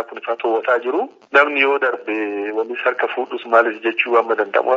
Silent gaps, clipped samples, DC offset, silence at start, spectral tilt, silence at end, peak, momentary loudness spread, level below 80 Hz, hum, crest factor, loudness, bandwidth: none; under 0.1%; under 0.1%; 0 s; 1 dB/octave; 0 s; 0 dBFS; 8 LU; -78 dBFS; none; 18 dB; -18 LUFS; 7.6 kHz